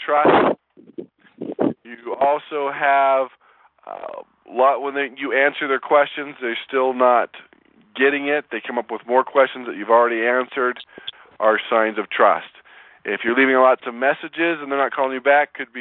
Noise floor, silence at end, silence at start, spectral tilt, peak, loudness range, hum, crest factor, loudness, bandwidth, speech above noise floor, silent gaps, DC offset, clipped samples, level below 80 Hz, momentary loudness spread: -50 dBFS; 0 s; 0 s; -8 dB/octave; -2 dBFS; 2 LU; none; 18 dB; -19 LUFS; 4.2 kHz; 31 dB; none; under 0.1%; under 0.1%; -68 dBFS; 18 LU